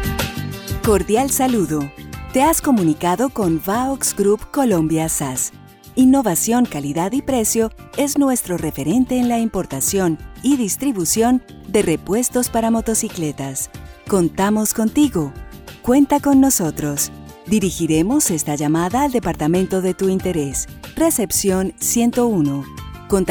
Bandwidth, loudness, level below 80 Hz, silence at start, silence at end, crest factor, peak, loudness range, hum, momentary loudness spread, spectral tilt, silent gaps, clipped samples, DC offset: over 20 kHz; -18 LUFS; -38 dBFS; 0 s; 0 s; 14 dB; -4 dBFS; 2 LU; none; 9 LU; -4.5 dB/octave; none; under 0.1%; under 0.1%